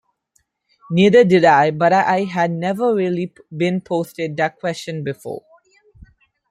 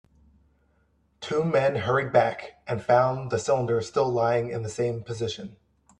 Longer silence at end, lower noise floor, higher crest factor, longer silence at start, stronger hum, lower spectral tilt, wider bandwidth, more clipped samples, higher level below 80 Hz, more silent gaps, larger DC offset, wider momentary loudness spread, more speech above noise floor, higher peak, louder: first, 1.1 s vs 0.45 s; about the same, -65 dBFS vs -67 dBFS; about the same, 16 dB vs 20 dB; second, 0.9 s vs 1.2 s; neither; about the same, -6.5 dB/octave vs -6 dB/octave; first, 14.5 kHz vs 10.5 kHz; neither; about the same, -58 dBFS vs -60 dBFS; neither; neither; first, 15 LU vs 11 LU; first, 49 dB vs 42 dB; first, -2 dBFS vs -8 dBFS; first, -17 LUFS vs -25 LUFS